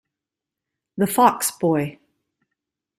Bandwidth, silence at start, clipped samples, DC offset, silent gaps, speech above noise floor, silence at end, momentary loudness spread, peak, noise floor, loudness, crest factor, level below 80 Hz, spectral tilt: 16 kHz; 0.95 s; under 0.1%; under 0.1%; none; 67 dB; 1.05 s; 13 LU; -2 dBFS; -87 dBFS; -20 LUFS; 22 dB; -64 dBFS; -4.5 dB/octave